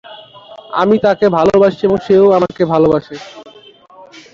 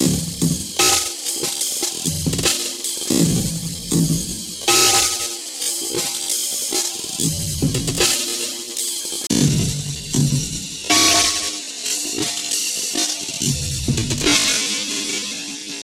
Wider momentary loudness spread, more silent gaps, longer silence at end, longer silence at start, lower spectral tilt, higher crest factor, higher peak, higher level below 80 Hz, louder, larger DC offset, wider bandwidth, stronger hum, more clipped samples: first, 14 LU vs 9 LU; neither; first, 0.9 s vs 0 s; about the same, 0.1 s vs 0 s; first, -7.5 dB/octave vs -2.5 dB/octave; second, 12 dB vs 18 dB; about the same, -2 dBFS vs -2 dBFS; second, -48 dBFS vs -40 dBFS; first, -12 LUFS vs -18 LUFS; neither; second, 7.4 kHz vs 16.5 kHz; neither; neither